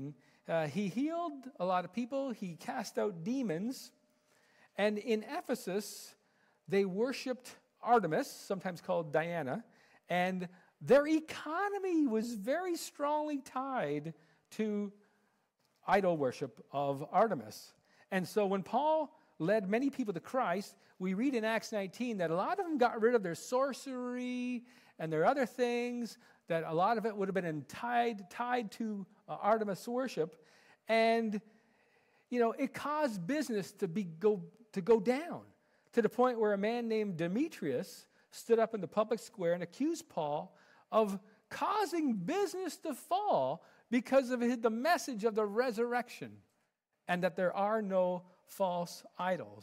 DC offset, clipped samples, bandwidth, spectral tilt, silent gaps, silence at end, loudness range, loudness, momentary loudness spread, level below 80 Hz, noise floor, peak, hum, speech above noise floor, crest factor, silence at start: under 0.1%; under 0.1%; 16 kHz; -5.5 dB/octave; none; 0 s; 4 LU; -35 LUFS; 12 LU; -80 dBFS; -81 dBFS; -18 dBFS; none; 47 dB; 18 dB; 0 s